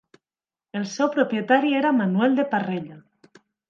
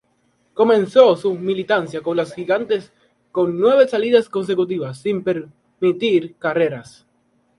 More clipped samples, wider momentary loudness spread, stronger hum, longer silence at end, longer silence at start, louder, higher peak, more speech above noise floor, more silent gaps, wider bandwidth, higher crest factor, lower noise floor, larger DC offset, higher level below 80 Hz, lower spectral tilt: neither; about the same, 12 LU vs 10 LU; neither; about the same, 0.7 s vs 0.75 s; first, 0.75 s vs 0.55 s; second, -22 LUFS vs -18 LUFS; second, -4 dBFS vs 0 dBFS; first, over 68 dB vs 46 dB; neither; second, 7.4 kHz vs 11.5 kHz; about the same, 20 dB vs 18 dB; first, under -90 dBFS vs -63 dBFS; neither; second, -76 dBFS vs -64 dBFS; about the same, -6 dB/octave vs -6.5 dB/octave